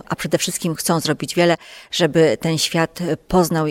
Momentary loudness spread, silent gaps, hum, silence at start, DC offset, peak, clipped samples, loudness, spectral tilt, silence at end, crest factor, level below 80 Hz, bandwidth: 6 LU; none; none; 0.1 s; under 0.1%; -4 dBFS; under 0.1%; -19 LUFS; -4.5 dB/octave; 0 s; 16 dB; -46 dBFS; 16.5 kHz